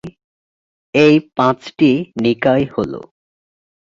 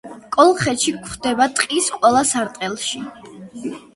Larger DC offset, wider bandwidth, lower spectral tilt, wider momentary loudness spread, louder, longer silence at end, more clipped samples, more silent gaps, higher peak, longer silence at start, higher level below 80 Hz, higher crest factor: neither; second, 7.6 kHz vs 11.5 kHz; first, -7 dB/octave vs -3 dB/octave; second, 11 LU vs 16 LU; first, -15 LUFS vs -18 LUFS; first, 0.8 s vs 0.15 s; neither; first, 0.24-0.93 s vs none; about the same, 0 dBFS vs 0 dBFS; about the same, 0.05 s vs 0.05 s; about the same, -52 dBFS vs -54 dBFS; about the same, 16 dB vs 18 dB